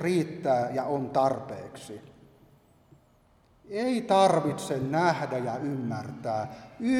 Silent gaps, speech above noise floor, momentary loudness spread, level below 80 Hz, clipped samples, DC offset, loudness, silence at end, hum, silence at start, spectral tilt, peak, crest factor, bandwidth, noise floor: none; 35 dB; 17 LU; -66 dBFS; under 0.1%; under 0.1%; -28 LUFS; 0 s; none; 0 s; -6 dB/octave; -10 dBFS; 18 dB; 15.5 kHz; -62 dBFS